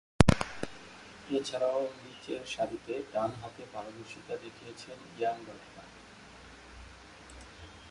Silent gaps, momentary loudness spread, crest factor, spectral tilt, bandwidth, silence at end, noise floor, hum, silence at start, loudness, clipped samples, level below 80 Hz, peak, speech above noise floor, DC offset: none; 20 LU; 34 dB; -5.5 dB/octave; 11.5 kHz; 0 s; -53 dBFS; none; 0.2 s; -34 LUFS; under 0.1%; -48 dBFS; 0 dBFS; 16 dB; under 0.1%